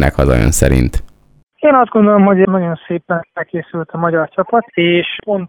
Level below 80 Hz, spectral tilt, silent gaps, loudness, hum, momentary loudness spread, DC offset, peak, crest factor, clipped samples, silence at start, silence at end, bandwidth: -24 dBFS; -6 dB/octave; 1.43-1.47 s; -13 LUFS; none; 12 LU; under 0.1%; 0 dBFS; 14 dB; 0.1%; 0 s; 0 s; over 20 kHz